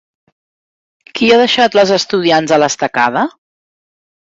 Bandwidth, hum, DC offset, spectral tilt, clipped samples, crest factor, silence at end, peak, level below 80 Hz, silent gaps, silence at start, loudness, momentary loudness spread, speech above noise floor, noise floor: 8 kHz; none; under 0.1%; -3.5 dB/octave; under 0.1%; 14 dB; 0.95 s; 0 dBFS; -56 dBFS; none; 1.15 s; -12 LUFS; 8 LU; over 79 dB; under -90 dBFS